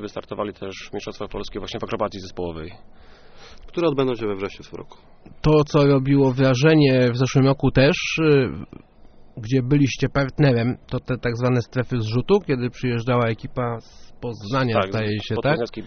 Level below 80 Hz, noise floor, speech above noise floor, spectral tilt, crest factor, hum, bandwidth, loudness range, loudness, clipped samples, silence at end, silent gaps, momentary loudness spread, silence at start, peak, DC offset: -42 dBFS; -46 dBFS; 25 dB; -6 dB/octave; 18 dB; none; 6.6 kHz; 10 LU; -21 LUFS; under 0.1%; 0 s; none; 15 LU; 0 s; -2 dBFS; under 0.1%